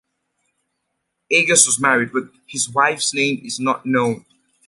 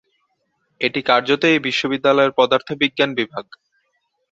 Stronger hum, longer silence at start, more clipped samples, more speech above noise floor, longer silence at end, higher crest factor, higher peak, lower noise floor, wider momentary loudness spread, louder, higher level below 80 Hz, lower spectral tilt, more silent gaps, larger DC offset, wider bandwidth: neither; first, 1.3 s vs 0.8 s; neither; first, 56 dB vs 52 dB; second, 0.5 s vs 0.9 s; about the same, 20 dB vs 20 dB; about the same, 0 dBFS vs 0 dBFS; first, -75 dBFS vs -69 dBFS; first, 12 LU vs 8 LU; about the same, -17 LUFS vs -17 LUFS; about the same, -66 dBFS vs -64 dBFS; second, -2 dB/octave vs -4.5 dB/octave; neither; neither; first, 11.5 kHz vs 7.8 kHz